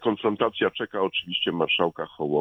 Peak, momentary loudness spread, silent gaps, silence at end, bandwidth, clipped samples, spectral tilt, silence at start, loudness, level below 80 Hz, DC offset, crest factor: -8 dBFS; 5 LU; none; 0 s; 6 kHz; under 0.1%; -7 dB/octave; 0 s; -25 LUFS; -64 dBFS; under 0.1%; 18 dB